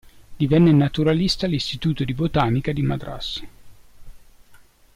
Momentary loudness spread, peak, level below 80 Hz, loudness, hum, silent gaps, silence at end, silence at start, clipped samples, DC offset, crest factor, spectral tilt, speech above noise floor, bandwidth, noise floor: 13 LU; -8 dBFS; -40 dBFS; -21 LUFS; none; none; 0.4 s; 0.3 s; under 0.1%; under 0.1%; 14 dB; -7 dB/octave; 30 dB; 12.5 kHz; -50 dBFS